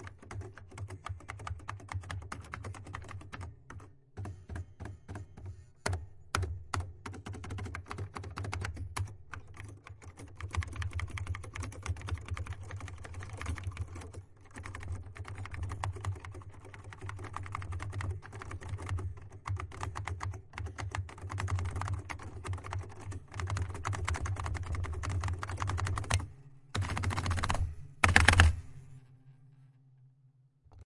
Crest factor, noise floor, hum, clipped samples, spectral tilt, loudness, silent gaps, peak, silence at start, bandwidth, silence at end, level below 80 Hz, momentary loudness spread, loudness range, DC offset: 34 dB; -65 dBFS; none; under 0.1%; -4.5 dB/octave; -37 LUFS; none; -2 dBFS; 0 s; 11.5 kHz; 0 s; -46 dBFS; 14 LU; 14 LU; under 0.1%